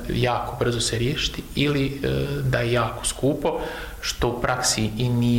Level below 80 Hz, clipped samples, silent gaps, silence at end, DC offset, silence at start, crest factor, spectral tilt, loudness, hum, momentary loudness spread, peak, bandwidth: -38 dBFS; under 0.1%; none; 0 s; under 0.1%; 0 s; 18 dB; -4.5 dB/octave; -24 LUFS; none; 4 LU; -6 dBFS; 16.5 kHz